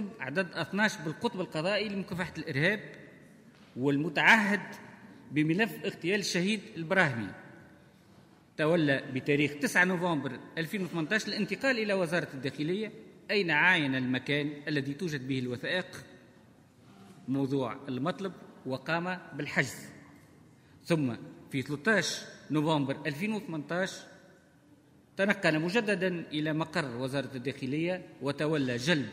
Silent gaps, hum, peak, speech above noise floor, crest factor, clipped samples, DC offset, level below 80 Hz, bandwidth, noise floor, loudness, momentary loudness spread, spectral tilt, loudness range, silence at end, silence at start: none; none; -8 dBFS; 30 dB; 24 dB; under 0.1%; under 0.1%; -72 dBFS; 16 kHz; -60 dBFS; -30 LUFS; 12 LU; -5 dB/octave; 6 LU; 0 s; 0 s